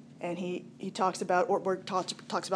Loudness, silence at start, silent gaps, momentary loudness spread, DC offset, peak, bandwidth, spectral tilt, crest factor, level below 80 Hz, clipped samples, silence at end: -32 LUFS; 0 s; none; 10 LU; under 0.1%; -14 dBFS; 11 kHz; -4.5 dB/octave; 18 dB; -82 dBFS; under 0.1%; 0 s